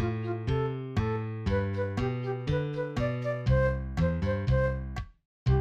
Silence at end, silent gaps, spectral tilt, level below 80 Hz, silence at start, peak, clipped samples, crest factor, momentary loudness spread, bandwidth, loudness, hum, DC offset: 0 s; 5.25-5.46 s; -8.5 dB/octave; -38 dBFS; 0 s; -14 dBFS; under 0.1%; 14 dB; 6 LU; 7.6 kHz; -30 LUFS; none; under 0.1%